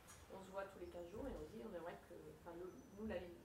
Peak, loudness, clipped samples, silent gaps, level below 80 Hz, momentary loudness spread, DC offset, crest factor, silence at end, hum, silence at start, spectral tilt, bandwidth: -36 dBFS; -53 LUFS; under 0.1%; none; -66 dBFS; 8 LU; under 0.1%; 18 dB; 0 s; none; 0 s; -6 dB/octave; 16 kHz